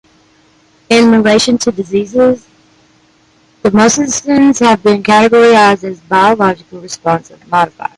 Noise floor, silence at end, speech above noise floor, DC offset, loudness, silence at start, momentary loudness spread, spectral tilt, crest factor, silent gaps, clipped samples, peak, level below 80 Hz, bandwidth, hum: -50 dBFS; 0.1 s; 40 dB; under 0.1%; -10 LUFS; 0.9 s; 11 LU; -4 dB/octave; 10 dB; none; under 0.1%; 0 dBFS; -48 dBFS; 11.5 kHz; none